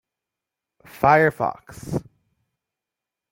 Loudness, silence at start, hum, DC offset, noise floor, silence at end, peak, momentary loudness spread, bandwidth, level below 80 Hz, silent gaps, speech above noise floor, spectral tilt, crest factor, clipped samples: -21 LUFS; 1 s; none; under 0.1%; -87 dBFS; 1.3 s; -2 dBFS; 14 LU; 17 kHz; -56 dBFS; none; 67 dB; -7 dB/octave; 22 dB; under 0.1%